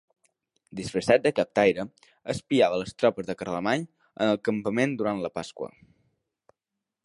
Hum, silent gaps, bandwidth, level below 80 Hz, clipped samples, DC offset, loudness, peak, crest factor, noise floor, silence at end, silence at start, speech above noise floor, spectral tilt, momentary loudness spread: none; none; 11.5 kHz; -62 dBFS; under 0.1%; under 0.1%; -26 LUFS; -6 dBFS; 22 dB; -87 dBFS; 1.4 s; 0.75 s; 61 dB; -5.5 dB/octave; 16 LU